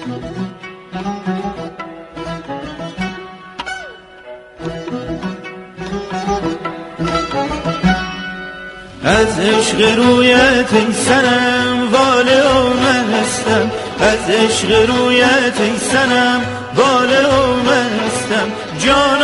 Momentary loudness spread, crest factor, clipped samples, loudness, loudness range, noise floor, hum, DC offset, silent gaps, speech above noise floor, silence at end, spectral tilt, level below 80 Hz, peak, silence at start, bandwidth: 17 LU; 14 dB; under 0.1%; -14 LUFS; 15 LU; -35 dBFS; none; under 0.1%; none; 23 dB; 0 s; -4 dB/octave; -38 dBFS; 0 dBFS; 0 s; 11.5 kHz